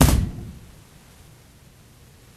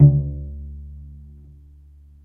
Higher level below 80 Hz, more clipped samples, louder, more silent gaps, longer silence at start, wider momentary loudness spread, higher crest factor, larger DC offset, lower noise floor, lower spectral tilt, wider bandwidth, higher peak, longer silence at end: first, -28 dBFS vs -34 dBFS; neither; about the same, -24 LUFS vs -22 LUFS; neither; about the same, 0 s vs 0 s; first, 27 LU vs 24 LU; about the same, 24 dB vs 20 dB; neither; about the same, -50 dBFS vs -47 dBFS; second, -5 dB/octave vs -15 dB/octave; first, 14 kHz vs 0.9 kHz; about the same, -2 dBFS vs 0 dBFS; first, 1.85 s vs 1.15 s